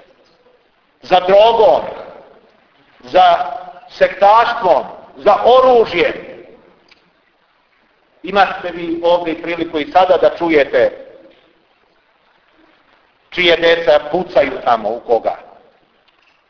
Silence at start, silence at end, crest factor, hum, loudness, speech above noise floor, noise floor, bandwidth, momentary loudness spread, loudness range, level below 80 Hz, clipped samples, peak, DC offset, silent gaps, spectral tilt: 1.05 s; 1.1 s; 16 dB; none; -13 LUFS; 45 dB; -57 dBFS; 5.4 kHz; 15 LU; 6 LU; -50 dBFS; under 0.1%; 0 dBFS; under 0.1%; none; -5.5 dB/octave